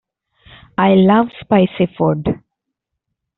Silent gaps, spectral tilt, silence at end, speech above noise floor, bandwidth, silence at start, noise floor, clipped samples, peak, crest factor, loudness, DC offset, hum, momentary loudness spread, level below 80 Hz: none; -6.5 dB/octave; 1 s; 65 dB; 4.1 kHz; 0.8 s; -78 dBFS; under 0.1%; -2 dBFS; 14 dB; -15 LUFS; under 0.1%; none; 12 LU; -48 dBFS